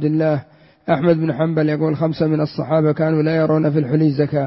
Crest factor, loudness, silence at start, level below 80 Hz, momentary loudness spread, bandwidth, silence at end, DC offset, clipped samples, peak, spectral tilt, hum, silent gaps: 14 dB; -18 LUFS; 0 s; -56 dBFS; 4 LU; 5.8 kHz; 0 s; under 0.1%; under 0.1%; -4 dBFS; -12.5 dB/octave; none; none